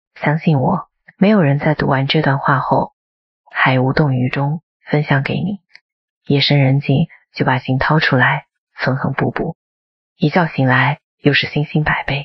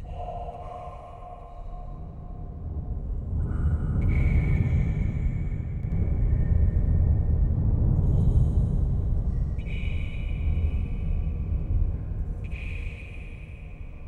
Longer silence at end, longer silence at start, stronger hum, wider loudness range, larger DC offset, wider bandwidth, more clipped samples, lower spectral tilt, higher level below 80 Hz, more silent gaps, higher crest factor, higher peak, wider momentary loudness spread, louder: about the same, 0 s vs 0 s; first, 0.15 s vs 0 s; neither; second, 2 LU vs 8 LU; neither; first, 6 kHz vs 4 kHz; neither; second, -8.5 dB/octave vs -10 dB/octave; second, -44 dBFS vs -28 dBFS; first, 2.93-3.44 s, 4.63-4.80 s, 5.81-6.21 s, 8.58-8.67 s, 9.55-10.16 s, 11.04-11.18 s vs none; about the same, 16 dB vs 16 dB; first, 0 dBFS vs -10 dBFS; second, 9 LU vs 17 LU; first, -16 LUFS vs -28 LUFS